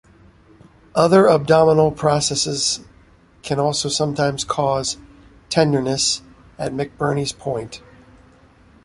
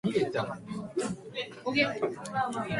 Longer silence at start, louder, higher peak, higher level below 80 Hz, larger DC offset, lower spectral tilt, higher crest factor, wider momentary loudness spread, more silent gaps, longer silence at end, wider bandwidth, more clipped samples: first, 0.95 s vs 0.05 s; first, -19 LUFS vs -32 LUFS; first, -2 dBFS vs -12 dBFS; first, -50 dBFS vs -64 dBFS; neither; about the same, -4 dB/octave vs -5 dB/octave; about the same, 18 dB vs 18 dB; first, 14 LU vs 9 LU; neither; first, 1.05 s vs 0 s; about the same, 11.5 kHz vs 11.5 kHz; neither